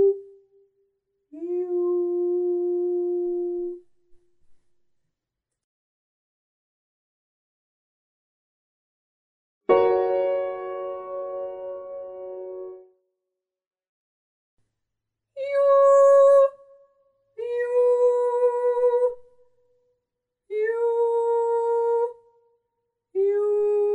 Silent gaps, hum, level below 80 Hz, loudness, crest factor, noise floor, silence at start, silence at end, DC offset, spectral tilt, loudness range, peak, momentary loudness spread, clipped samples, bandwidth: 5.64-9.61 s, 13.67-13.71 s, 13.89-14.57 s; none; -72 dBFS; -22 LUFS; 18 dB; -85 dBFS; 0 s; 0 s; under 0.1%; -5.5 dB/octave; 17 LU; -6 dBFS; 19 LU; under 0.1%; 9.8 kHz